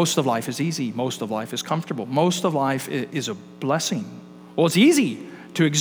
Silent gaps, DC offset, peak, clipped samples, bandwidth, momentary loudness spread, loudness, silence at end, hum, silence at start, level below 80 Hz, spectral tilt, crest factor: none; under 0.1%; -4 dBFS; under 0.1%; over 20 kHz; 14 LU; -23 LUFS; 0 s; none; 0 s; -74 dBFS; -4.5 dB/octave; 18 dB